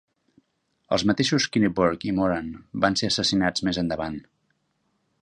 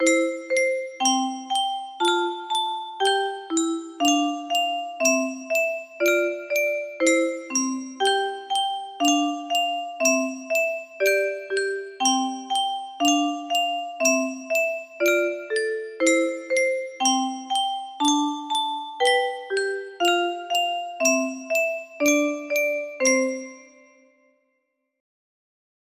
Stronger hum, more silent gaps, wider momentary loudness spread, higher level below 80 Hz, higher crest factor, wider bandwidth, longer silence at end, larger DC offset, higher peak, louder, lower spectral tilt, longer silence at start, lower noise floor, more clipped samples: neither; neither; first, 9 LU vs 6 LU; first, -50 dBFS vs -76 dBFS; about the same, 20 dB vs 18 dB; second, 11 kHz vs 15.5 kHz; second, 1 s vs 2.35 s; neither; about the same, -6 dBFS vs -6 dBFS; about the same, -24 LUFS vs -23 LUFS; first, -4.5 dB/octave vs 0 dB/octave; first, 0.9 s vs 0 s; about the same, -72 dBFS vs -75 dBFS; neither